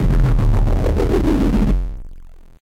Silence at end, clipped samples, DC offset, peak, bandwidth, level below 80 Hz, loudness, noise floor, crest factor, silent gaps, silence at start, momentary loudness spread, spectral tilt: 0.35 s; under 0.1%; under 0.1%; -6 dBFS; 8.8 kHz; -18 dBFS; -18 LUFS; -36 dBFS; 10 dB; none; 0 s; 8 LU; -8.5 dB/octave